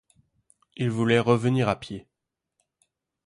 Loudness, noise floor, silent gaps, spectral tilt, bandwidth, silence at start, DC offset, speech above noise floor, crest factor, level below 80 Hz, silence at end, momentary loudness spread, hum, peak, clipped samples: -24 LUFS; -85 dBFS; none; -7 dB/octave; 11 kHz; 0.8 s; under 0.1%; 62 dB; 20 dB; -60 dBFS; 1.25 s; 15 LU; none; -8 dBFS; under 0.1%